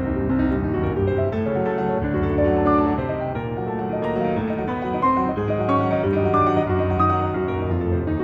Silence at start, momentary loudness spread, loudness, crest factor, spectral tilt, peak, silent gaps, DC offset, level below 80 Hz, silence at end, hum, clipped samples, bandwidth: 0 s; 6 LU; -22 LUFS; 14 dB; -10 dB/octave; -6 dBFS; none; under 0.1%; -36 dBFS; 0 s; none; under 0.1%; 5.4 kHz